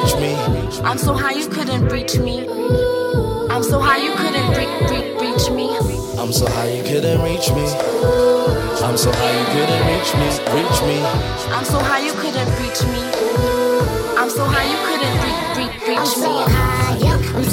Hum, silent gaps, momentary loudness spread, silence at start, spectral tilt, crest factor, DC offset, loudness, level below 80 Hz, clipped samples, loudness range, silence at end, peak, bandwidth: none; none; 4 LU; 0 s; -5 dB/octave; 12 dB; under 0.1%; -17 LUFS; -30 dBFS; under 0.1%; 2 LU; 0 s; -4 dBFS; 17 kHz